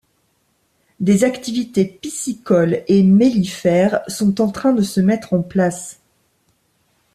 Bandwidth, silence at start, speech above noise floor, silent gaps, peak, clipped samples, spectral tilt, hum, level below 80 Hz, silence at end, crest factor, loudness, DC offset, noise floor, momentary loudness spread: 14 kHz; 1 s; 48 dB; none; -2 dBFS; under 0.1%; -6.5 dB/octave; none; -54 dBFS; 1.2 s; 14 dB; -17 LUFS; under 0.1%; -64 dBFS; 10 LU